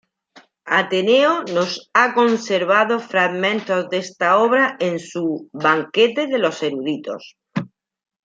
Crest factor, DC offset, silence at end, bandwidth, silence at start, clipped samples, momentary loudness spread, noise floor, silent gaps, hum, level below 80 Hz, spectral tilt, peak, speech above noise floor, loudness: 18 dB; under 0.1%; 0.6 s; 9 kHz; 0.35 s; under 0.1%; 12 LU; -51 dBFS; none; none; -72 dBFS; -4.5 dB/octave; -2 dBFS; 33 dB; -18 LUFS